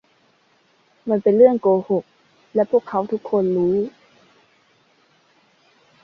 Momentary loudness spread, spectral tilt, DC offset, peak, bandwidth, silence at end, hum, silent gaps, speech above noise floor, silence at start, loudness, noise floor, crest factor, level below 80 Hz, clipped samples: 11 LU; -10 dB/octave; under 0.1%; -2 dBFS; 6 kHz; 2.15 s; none; none; 42 dB; 1.05 s; -19 LUFS; -60 dBFS; 20 dB; -64 dBFS; under 0.1%